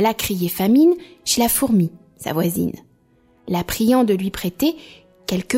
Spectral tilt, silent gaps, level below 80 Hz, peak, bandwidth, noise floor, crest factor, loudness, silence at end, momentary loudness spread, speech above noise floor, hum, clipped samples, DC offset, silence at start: -5 dB/octave; none; -46 dBFS; -6 dBFS; 16.5 kHz; -57 dBFS; 14 dB; -19 LUFS; 0 s; 11 LU; 38 dB; none; under 0.1%; under 0.1%; 0 s